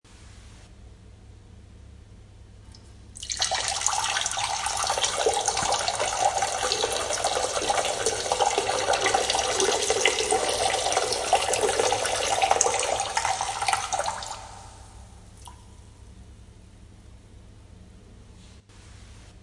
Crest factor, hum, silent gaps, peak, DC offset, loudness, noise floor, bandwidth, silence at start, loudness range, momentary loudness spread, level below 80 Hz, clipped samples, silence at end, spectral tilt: 26 dB; none; none; 0 dBFS; under 0.1%; -24 LUFS; -49 dBFS; 11.5 kHz; 0.1 s; 9 LU; 10 LU; -50 dBFS; under 0.1%; 0.05 s; -0.5 dB/octave